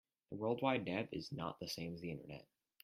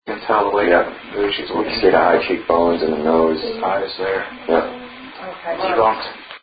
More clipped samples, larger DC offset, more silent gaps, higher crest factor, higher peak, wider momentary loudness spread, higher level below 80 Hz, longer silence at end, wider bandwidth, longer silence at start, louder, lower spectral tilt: neither; neither; neither; about the same, 22 dB vs 18 dB; second, -20 dBFS vs 0 dBFS; about the same, 15 LU vs 14 LU; second, -74 dBFS vs -48 dBFS; first, 0.4 s vs 0.05 s; first, 15.5 kHz vs 5 kHz; first, 0.3 s vs 0.05 s; second, -42 LUFS vs -18 LUFS; second, -5.5 dB/octave vs -10 dB/octave